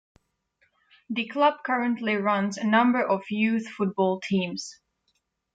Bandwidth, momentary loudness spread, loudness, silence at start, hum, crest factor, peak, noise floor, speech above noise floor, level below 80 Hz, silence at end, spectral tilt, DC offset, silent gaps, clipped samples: 9 kHz; 10 LU; -25 LUFS; 1.1 s; none; 18 dB; -10 dBFS; -74 dBFS; 50 dB; -72 dBFS; 0.8 s; -5.5 dB/octave; under 0.1%; none; under 0.1%